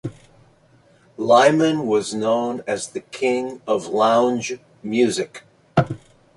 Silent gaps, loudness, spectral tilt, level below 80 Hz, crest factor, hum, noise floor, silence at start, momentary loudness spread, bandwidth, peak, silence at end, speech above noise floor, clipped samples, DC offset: none; -20 LUFS; -5 dB/octave; -56 dBFS; 20 dB; none; -55 dBFS; 0.05 s; 15 LU; 11.5 kHz; -2 dBFS; 0.4 s; 36 dB; under 0.1%; under 0.1%